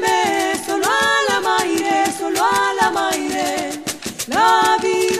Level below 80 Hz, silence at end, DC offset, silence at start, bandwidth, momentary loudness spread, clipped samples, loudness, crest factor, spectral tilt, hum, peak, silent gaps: -54 dBFS; 0 s; under 0.1%; 0 s; 15.5 kHz; 7 LU; under 0.1%; -17 LUFS; 14 dB; -2 dB/octave; none; -4 dBFS; none